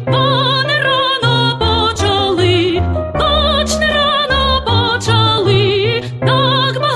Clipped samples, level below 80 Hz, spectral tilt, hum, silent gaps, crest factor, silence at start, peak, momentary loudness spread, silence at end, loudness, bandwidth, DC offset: under 0.1%; -28 dBFS; -5 dB/octave; none; none; 12 dB; 0 s; -2 dBFS; 3 LU; 0 s; -13 LUFS; 12.5 kHz; under 0.1%